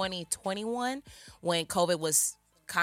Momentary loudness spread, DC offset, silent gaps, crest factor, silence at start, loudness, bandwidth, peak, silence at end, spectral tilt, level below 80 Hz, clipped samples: 11 LU; under 0.1%; none; 20 dB; 0 s; -30 LUFS; 16.5 kHz; -12 dBFS; 0 s; -2.5 dB/octave; -64 dBFS; under 0.1%